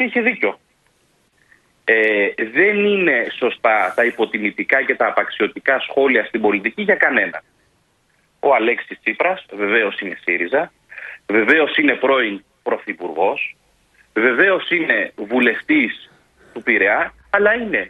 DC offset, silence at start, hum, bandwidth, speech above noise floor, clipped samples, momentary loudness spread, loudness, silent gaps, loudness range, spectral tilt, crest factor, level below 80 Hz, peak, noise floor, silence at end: under 0.1%; 0 s; none; 11.5 kHz; 44 dB; under 0.1%; 10 LU; -17 LUFS; none; 3 LU; -6 dB/octave; 18 dB; -60 dBFS; 0 dBFS; -61 dBFS; 0 s